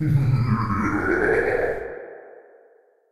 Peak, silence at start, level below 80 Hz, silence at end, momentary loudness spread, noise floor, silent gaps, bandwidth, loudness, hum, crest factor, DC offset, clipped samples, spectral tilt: -8 dBFS; 0 s; -42 dBFS; 0 s; 17 LU; -57 dBFS; none; 12 kHz; -22 LUFS; none; 14 dB; under 0.1%; under 0.1%; -8.5 dB/octave